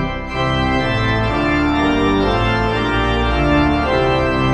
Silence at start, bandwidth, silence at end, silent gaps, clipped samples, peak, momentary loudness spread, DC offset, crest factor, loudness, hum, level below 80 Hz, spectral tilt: 0 s; 10 kHz; 0 s; none; under 0.1%; -4 dBFS; 2 LU; under 0.1%; 12 dB; -16 LUFS; none; -26 dBFS; -7 dB/octave